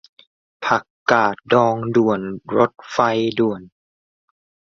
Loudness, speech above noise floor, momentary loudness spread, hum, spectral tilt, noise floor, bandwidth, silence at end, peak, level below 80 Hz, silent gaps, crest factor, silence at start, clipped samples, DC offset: -19 LUFS; over 72 dB; 6 LU; none; -6 dB/octave; under -90 dBFS; 7.4 kHz; 1.1 s; 0 dBFS; -60 dBFS; 0.90-1.06 s; 20 dB; 0.6 s; under 0.1%; under 0.1%